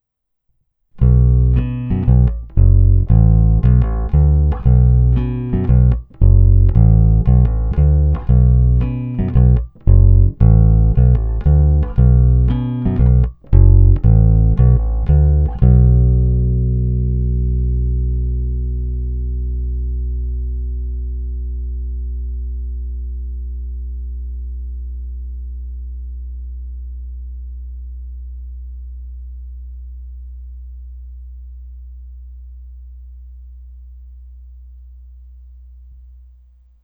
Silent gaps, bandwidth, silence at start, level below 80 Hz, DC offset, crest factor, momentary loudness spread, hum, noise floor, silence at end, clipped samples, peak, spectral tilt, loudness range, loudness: none; 2.6 kHz; 0.95 s; -16 dBFS; under 0.1%; 14 dB; 21 LU; none; -69 dBFS; 1.75 s; under 0.1%; 0 dBFS; -13.5 dB/octave; 20 LU; -15 LUFS